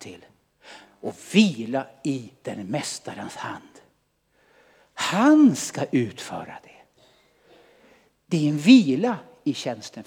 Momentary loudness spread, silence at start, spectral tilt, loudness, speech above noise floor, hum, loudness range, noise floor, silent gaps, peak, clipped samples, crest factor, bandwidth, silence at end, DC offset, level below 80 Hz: 21 LU; 0 s; -5 dB/octave; -22 LUFS; 46 dB; none; 9 LU; -68 dBFS; none; -2 dBFS; under 0.1%; 22 dB; 15.5 kHz; 0.05 s; under 0.1%; -74 dBFS